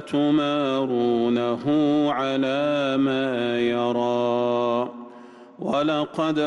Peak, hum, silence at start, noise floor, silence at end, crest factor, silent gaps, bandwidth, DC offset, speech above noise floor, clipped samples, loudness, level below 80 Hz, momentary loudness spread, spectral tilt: -12 dBFS; none; 0 s; -45 dBFS; 0 s; 10 dB; none; 9.4 kHz; under 0.1%; 23 dB; under 0.1%; -23 LUFS; -64 dBFS; 4 LU; -6.5 dB/octave